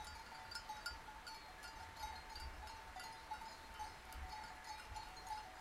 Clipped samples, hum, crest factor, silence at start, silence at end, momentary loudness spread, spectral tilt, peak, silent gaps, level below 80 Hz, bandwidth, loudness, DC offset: under 0.1%; none; 18 dB; 0 s; 0 s; 4 LU; -2.5 dB/octave; -34 dBFS; none; -60 dBFS; 16 kHz; -52 LUFS; under 0.1%